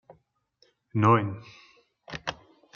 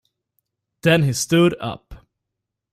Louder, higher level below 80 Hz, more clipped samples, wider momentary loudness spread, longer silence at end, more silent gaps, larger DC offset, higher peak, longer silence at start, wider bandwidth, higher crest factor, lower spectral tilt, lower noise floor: second, -26 LUFS vs -19 LUFS; second, -64 dBFS vs -50 dBFS; neither; first, 19 LU vs 14 LU; second, 0.45 s vs 0.75 s; neither; neither; about the same, -6 dBFS vs -4 dBFS; about the same, 0.95 s vs 0.85 s; second, 7 kHz vs 15.5 kHz; first, 24 dB vs 18 dB; first, -7.5 dB/octave vs -5 dB/octave; second, -67 dBFS vs -82 dBFS